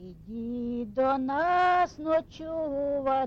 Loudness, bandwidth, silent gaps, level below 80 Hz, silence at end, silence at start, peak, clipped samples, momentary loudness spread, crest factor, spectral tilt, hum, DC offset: -28 LUFS; 7.4 kHz; none; -54 dBFS; 0 s; 0 s; -16 dBFS; under 0.1%; 12 LU; 12 dB; -6 dB/octave; none; under 0.1%